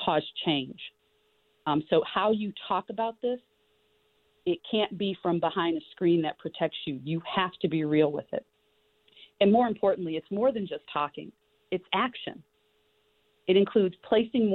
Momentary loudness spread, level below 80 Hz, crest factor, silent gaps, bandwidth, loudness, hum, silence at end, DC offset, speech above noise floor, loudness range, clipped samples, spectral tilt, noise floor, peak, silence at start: 12 LU; -68 dBFS; 20 dB; none; 4.5 kHz; -28 LUFS; none; 0 s; under 0.1%; 42 dB; 3 LU; under 0.1%; -9 dB/octave; -70 dBFS; -8 dBFS; 0 s